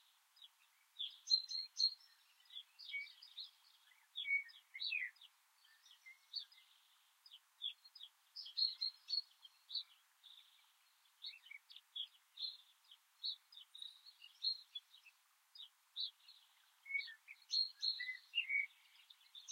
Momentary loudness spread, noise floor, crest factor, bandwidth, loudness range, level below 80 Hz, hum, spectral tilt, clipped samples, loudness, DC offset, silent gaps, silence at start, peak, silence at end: 25 LU; -75 dBFS; 26 dB; 16 kHz; 9 LU; under -90 dBFS; none; 8 dB/octave; under 0.1%; -43 LUFS; under 0.1%; none; 0.4 s; -22 dBFS; 0 s